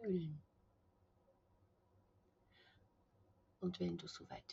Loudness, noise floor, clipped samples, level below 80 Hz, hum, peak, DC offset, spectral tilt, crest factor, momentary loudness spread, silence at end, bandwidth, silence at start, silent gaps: -46 LUFS; -75 dBFS; under 0.1%; -78 dBFS; none; -30 dBFS; under 0.1%; -6.5 dB/octave; 20 dB; 10 LU; 0 s; 7.4 kHz; 0 s; none